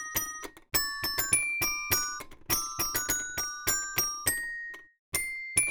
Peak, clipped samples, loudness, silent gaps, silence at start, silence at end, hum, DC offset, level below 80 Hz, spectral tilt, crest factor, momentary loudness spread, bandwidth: -10 dBFS; under 0.1%; -29 LUFS; 4.99-5.12 s; 0 s; 0 s; none; under 0.1%; -52 dBFS; 0 dB/octave; 22 dB; 11 LU; over 20 kHz